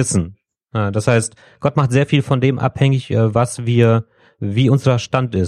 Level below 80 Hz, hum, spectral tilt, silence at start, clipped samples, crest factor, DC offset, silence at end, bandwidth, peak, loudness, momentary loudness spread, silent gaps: -48 dBFS; none; -6 dB/octave; 0 s; under 0.1%; 16 dB; under 0.1%; 0 s; 12 kHz; -2 dBFS; -17 LUFS; 8 LU; none